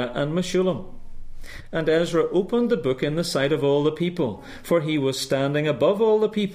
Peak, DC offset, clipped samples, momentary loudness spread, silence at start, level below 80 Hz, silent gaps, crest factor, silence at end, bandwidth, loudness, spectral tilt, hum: -8 dBFS; under 0.1%; under 0.1%; 8 LU; 0 s; -44 dBFS; none; 14 dB; 0 s; 15.5 kHz; -23 LUFS; -6 dB/octave; none